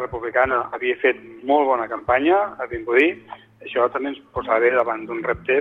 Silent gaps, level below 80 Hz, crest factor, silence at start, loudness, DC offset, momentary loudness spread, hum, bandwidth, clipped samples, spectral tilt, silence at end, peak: none; -50 dBFS; 18 dB; 0 s; -21 LUFS; under 0.1%; 10 LU; none; 4.1 kHz; under 0.1%; -7 dB/octave; 0 s; -4 dBFS